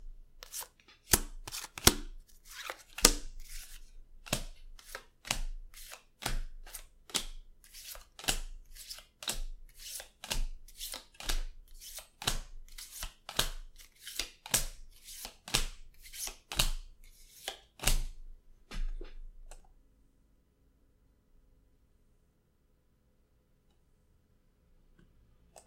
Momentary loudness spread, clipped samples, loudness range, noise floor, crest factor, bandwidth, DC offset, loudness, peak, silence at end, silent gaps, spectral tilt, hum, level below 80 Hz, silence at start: 22 LU; under 0.1%; 10 LU; -70 dBFS; 38 dB; 16.5 kHz; under 0.1%; -35 LUFS; 0 dBFS; 0.05 s; none; -1.5 dB/octave; none; -42 dBFS; 0 s